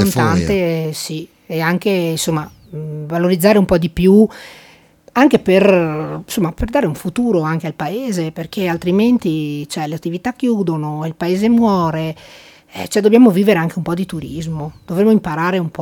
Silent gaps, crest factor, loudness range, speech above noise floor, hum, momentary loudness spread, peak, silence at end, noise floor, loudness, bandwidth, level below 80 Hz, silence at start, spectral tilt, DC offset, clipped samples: none; 16 dB; 4 LU; 31 dB; none; 13 LU; 0 dBFS; 0 s; -46 dBFS; -16 LUFS; 19 kHz; -40 dBFS; 0 s; -6.5 dB/octave; under 0.1%; under 0.1%